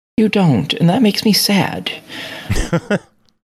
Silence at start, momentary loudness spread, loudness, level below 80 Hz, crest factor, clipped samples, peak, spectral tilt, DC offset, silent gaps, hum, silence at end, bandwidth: 0.2 s; 12 LU; -15 LUFS; -32 dBFS; 14 dB; under 0.1%; -2 dBFS; -5 dB/octave; under 0.1%; none; none; 0.55 s; 15 kHz